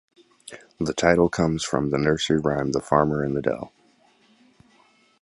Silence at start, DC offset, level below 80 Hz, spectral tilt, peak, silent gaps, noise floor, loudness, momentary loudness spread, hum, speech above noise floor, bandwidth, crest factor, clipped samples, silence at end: 0.45 s; under 0.1%; -48 dBFS; -5.5 dB/octave; -2 dBFS; none; -60 dBFS; -23 LUFS; 18 LU; none; 37 dB; 11.5 kHz; 22 dB; under 0.1%; 1.55 s